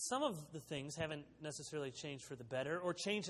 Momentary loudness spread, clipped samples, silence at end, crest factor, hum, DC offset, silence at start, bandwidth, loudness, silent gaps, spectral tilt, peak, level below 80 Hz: 9 LU; under 0.1%; 0 s; 18 dB; none; under 0.1%; 0 s; 13 kHz; -44 LUFS; none; -3.5 dB/octave; -24 dBFS; -74 dBFS